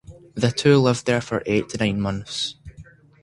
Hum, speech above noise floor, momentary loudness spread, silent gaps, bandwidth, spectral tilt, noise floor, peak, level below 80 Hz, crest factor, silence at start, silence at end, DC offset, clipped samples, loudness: none; 26 dB; 11 LU; none; 11.5 kHz; -5.5 dB/octave; -47 dBFS; -2 dBFS; -48 dBFS; 20 dB; 0.1 s; 0.4 s; under 0.1%; under 0.1%; -21 LUFS